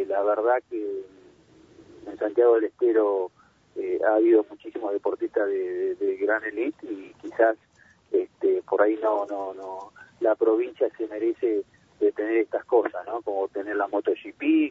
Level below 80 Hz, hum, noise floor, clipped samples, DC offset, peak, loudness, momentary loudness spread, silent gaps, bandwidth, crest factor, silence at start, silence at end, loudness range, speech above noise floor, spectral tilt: -72 dBFS; none; -55 dBFS; under 0.1%; under 0.1%; -6 dBFS; -25 LUFS; 14 LU; none; 4.1 kHz; 18 dB; 0 s; 0 s; 3 LU; 30 dB; -6.5 dB/octave